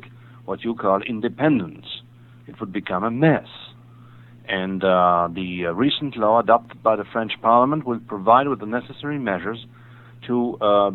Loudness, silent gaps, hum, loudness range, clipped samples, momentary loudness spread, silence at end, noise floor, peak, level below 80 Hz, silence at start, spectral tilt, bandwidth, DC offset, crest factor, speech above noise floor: -21 LUFS; none; none; 5 LU; under 0.1%; 17 LU; 0 s; -45 dBFS; -2 dBFS; -60 dBFS; 0.05 s; -9 dB/octave; 4.2 kHz; under 0.1%; 20 dB; 25 dB